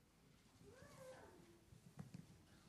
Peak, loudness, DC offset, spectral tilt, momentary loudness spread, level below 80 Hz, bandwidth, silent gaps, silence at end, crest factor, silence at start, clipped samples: -42 dBFS; -63 LUFS; under 0.1%; -5.5 dB/octave; 8 LU; -78 dBFS; 15 kHz; none; 0 s; 20 dB; 0 s; under 0.1%